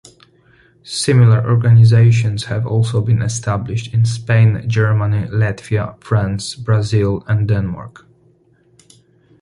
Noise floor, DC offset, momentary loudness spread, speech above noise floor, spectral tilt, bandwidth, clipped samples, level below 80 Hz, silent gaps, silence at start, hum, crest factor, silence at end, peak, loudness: -54 dBFS; under 0.1%; 10 LU; 40 dB; -6.5 dB/octave; 11.5 kHz; under 0.1%; -40 dBFS; none; 0.85 s; none; 14 dB; 1.55 s; -2 dBFS; -15 LUFS